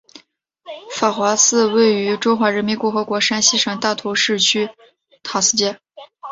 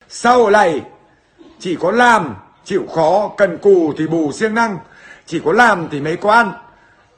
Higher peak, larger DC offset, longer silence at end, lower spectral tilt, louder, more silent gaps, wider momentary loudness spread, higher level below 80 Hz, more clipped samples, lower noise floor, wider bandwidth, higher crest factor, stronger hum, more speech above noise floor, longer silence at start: about the same, 0 dBFS vs 0 dBFS; neither; second, 0 s vs 0.55 s; second, -2 dB/octave vs -5 dB/octave; about the same, -16 LUFS vs -14 LUFS; neither; about the same, 15 LU vs 13 LU; second, -62 dBFS vs -54 dBFS; neither; first, -54 dBFS vs -49 dBFS; second, 8 kHz vs 10 kHz; about the same, 18 dB vs 16 dB; neither; about the same, 36 dB vs 35 dB; first, 0.65 s vs 0.1 s